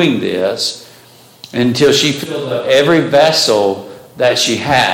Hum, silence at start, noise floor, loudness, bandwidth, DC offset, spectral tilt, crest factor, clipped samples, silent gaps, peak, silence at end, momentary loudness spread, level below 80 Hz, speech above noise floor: none; 0 s; -42 dBFS; -13 LUFS; 17 kHz; under 0.1%; -3.5 dB/octave; 12 dB; under 0.1%; none; 0 dBFS; 0 s; 10 LU; -52 dBFS; 30 dB